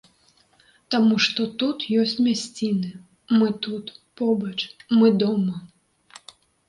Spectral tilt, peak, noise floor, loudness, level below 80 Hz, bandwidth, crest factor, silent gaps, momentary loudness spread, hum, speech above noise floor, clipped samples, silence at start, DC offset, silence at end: -5.5 dB/octave; -8 dBFS; -60 dBFS; -22 LUFS; -68 dBFS; 11 kHz; 16 dB; none; 12 LU; none; 39 dB; under 0.1%; 0.9 s; under 0.1%; 1.05 s